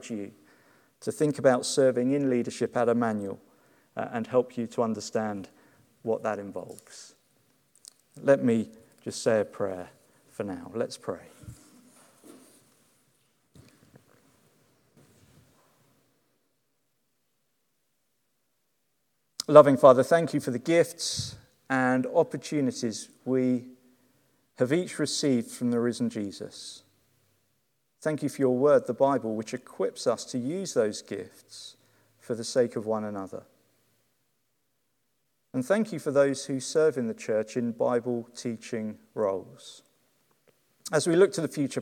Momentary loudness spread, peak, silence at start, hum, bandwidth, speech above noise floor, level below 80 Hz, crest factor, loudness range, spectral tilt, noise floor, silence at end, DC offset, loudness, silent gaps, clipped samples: 18 LU; 0 dBFS; 0 s; none; 16.5 kHz; 51 dB; -74 dBFS; 28 dB; 12 LU; -5 dB/octave; -77 dBFS; 0 s; under 0.1%; -27 LUFS; none; under 0.1%